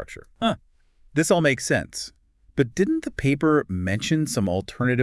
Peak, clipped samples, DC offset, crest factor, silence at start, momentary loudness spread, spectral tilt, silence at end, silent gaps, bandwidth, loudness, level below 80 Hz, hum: -6 dBFS; under 0.1%; under 0.1%; 18 dB; 0 s; 13 LU; -5 dB/octave; 0 s; none; 12 kHz; -23 LUFS; -50 dBFS; none